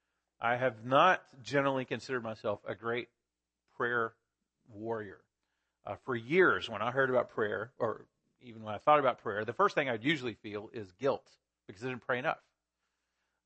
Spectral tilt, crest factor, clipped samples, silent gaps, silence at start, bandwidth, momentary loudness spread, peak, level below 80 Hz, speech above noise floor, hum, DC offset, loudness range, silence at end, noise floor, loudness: -6 dB/octave; 22 dB; under 0.1%; none; 0.4 s; 8.6 kHz; 16 LU; -12 dBFS; -76 dBFS; 56 dB; none; under 0.1%; 7 LU; 1.1 s; -89 dBFS; -32 LUFS